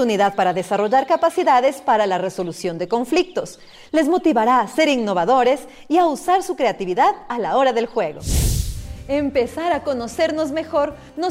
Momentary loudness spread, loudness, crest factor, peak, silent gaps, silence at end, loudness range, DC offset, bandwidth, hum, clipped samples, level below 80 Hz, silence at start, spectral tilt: 9 LU; -19 LUFS; 12 dB; -6 dBFS; none; 0 s; 3 LU; under 0.1%; 16 kHz; none; under 0.1%; -34 dBFS; 0 s; -5 dB/octave